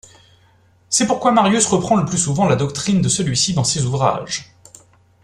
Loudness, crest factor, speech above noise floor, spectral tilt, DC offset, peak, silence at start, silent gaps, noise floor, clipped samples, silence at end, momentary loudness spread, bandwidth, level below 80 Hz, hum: -17 LUFS; 18 dB; 37 dB; -4 dB/octave; under 0.1%; -2 dBFS; 0.9 s; none; -54 dBFS; under 0.1%; 0.8 s; 5 LU; 12.5 kHz; -48 dBFS; none